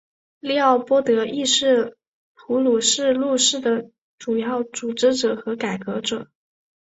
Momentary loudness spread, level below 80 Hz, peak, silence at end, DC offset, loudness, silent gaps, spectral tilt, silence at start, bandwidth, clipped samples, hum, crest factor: 9 LU; -66 dBFS; -4 dBFS; 0.65 s; under 0.1%; -20 LUFS; 2.07-2.35 s, 3.98-4.18 s; -2.5 dB/octave; 0.45 s; 8.2 kHz; under 0.1%; none; 18 dB